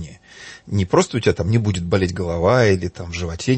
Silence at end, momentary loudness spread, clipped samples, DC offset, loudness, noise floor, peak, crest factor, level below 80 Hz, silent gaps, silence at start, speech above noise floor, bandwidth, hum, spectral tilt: 0 s; 20 LU; under 0.1%; under 0.1%; -19 LUFS; -41 dBFS; -4 dBFS; 16 dB; -40 dBFS; none; 0 s; 23 dB; 8.8 kHz; none; -6 dB/octave